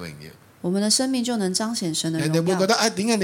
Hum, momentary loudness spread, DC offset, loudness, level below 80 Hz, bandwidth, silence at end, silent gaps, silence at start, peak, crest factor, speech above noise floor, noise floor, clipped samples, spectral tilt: none; 9 LU; under 0.1%; -22 LUFS; -64 dBFS; 17 kHz; 0 s; none; 0 s; -6 dBFS; 18 dB; 22 dB; -44 dBFS; under 0.1%; -4 dB/octave